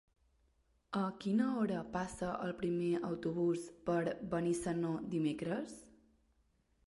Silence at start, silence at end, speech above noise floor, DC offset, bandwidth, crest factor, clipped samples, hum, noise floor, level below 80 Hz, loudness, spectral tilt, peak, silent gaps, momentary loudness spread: 0.9 s; 1 s; 39 dB; under 0.1%; 11.5 kHz; 16 dB; under 0.1%; none; -75 dBFS; -66 dBFS; -37 LUFS; -6.5 dB/octave; -22 dBFS; none; 6 LU